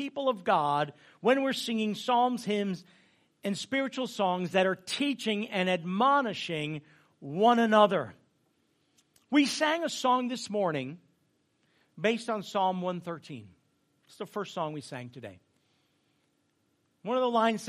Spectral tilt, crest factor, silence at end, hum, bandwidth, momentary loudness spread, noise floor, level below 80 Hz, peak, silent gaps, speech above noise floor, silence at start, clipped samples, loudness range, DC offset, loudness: -4.5 dB/octave; 22 dB; 0 s; none; 15 kHz; 17 LU; -74 dBFS; -80 dBFS; -10 dBFS; none; 45 dB; 0 s; under 0.1%; 11 LU; under 0.1%; -29 LUFS